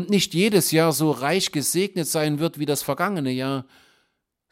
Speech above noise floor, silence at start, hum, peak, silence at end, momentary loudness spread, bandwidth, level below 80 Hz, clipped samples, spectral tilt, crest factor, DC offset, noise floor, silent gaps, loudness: 51 dB; 0 s; none; -6 dBFS; 0.9 s; 6 LU; 17 kHz; -64 dBFS; under 0.1%; -4 dB/octave; 18 dB; under 0.1%; -73 dBFS; none; -22 LUFS